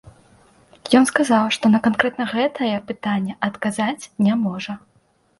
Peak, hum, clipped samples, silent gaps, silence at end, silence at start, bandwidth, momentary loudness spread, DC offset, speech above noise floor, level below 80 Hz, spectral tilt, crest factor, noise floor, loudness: 0 dBFS; none; under 0.1%; none; 0.65 s; 0.05 s; 11.5 kHz; 9 LU; under 0.1%; 34 dB; -60 dBFS; -5 dB/octave; 20 dB; -53 dBFS; -20 LUFS